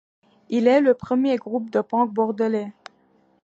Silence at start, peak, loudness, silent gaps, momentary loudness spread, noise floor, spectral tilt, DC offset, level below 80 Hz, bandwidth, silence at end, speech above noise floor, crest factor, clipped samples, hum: 0.5 s; -6 dBFS; -21 LUFS; none; 9 LU; -61 dBFS; -7 dB/octave; under 0.1%; -66 dBFS; 7.8 kHz; 0.75 s; 40 dB; 18 dB; under 0.1%; none